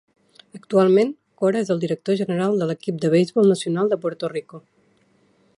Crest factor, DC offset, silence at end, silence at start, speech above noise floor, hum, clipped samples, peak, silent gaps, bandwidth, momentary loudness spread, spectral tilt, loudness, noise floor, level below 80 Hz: 16 dB; under 0.1%; 1 s; 0.55 s; 41 dB; none; under 0.1%; -4 dBFS; none; 11.5 kHz; 9 LU; -7 dB/octave; -21 LUFS; -61 dBFS; -70 dBFS